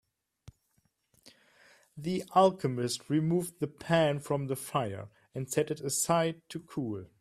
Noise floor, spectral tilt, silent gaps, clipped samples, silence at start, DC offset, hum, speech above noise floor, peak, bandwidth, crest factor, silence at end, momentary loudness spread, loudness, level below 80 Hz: -74 dBFS; -5 dB/octave; none; under 0.1%; 0.45 s; under 0.1%; none; 44 dB; -10 dBFS; 15.5 kHz; 22 dB; 0.15 s; 14 LU; -31 LUFS; -68 dBFS